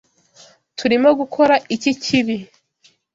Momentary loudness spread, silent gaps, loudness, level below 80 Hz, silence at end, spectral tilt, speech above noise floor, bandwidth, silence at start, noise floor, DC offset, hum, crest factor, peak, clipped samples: 10 LU; none; -17 LUFS; -60 dBFS; 0.7 s; -4.5 dB/octave; 41 dB; 7.8 kHz; 0.8 s; -58 dBFS; under 0.1%; none; 16 dB; -2 dBFS; under 0.1%